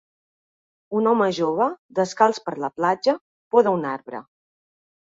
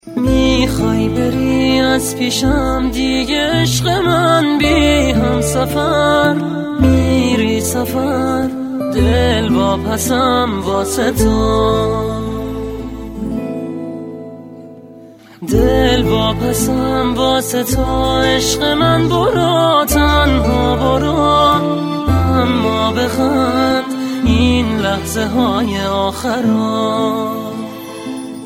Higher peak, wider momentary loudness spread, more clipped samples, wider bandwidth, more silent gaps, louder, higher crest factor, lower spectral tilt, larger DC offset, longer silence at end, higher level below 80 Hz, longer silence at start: second, -4 dBFS vs 0 dBFS; about the same, 10 LU vs 10 LU; neither; second, 7.8 kHz vs 16.5 kHz; first, 1.79-1.89 s, 3.21-3.51 s vs none; second, -22 LUFS vs -14 LUFS; first, 20 dB vs 14 dB; about the same, -5.5 dB/octave vs -5 dB/octave; neither; first, 0.8 s vs 0 s; second, -70 dBFS vs -26 dBFS; first, 0.9 s vs 0.05 s